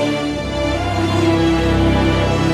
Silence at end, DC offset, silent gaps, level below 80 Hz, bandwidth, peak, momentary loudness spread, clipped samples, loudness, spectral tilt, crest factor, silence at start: 0 s; under 0.1%; none; -26 dBFS; 13 kHz; -4 dBFS; 5 LU; under 0.1%; -17 LUFS; -6.5 dB/octave; 12 dB; 0 s